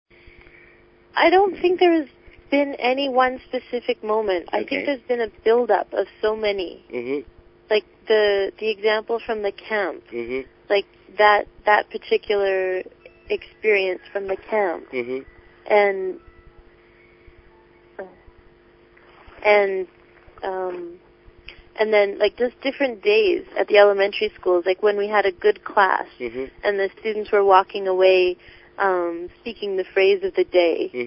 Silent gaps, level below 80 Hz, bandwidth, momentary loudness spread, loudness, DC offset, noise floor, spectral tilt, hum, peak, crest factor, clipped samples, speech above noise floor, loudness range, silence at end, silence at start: none; -56 dBFS; 5.8 kHz; 14 LU; -21 LUFS; under 0.1%; -52 dBFS; -8.5 dB/octave; none; 0 dBFS; 22 dB; under 0.1%; 32 dB; 6 LU; 0 s; 1.15 s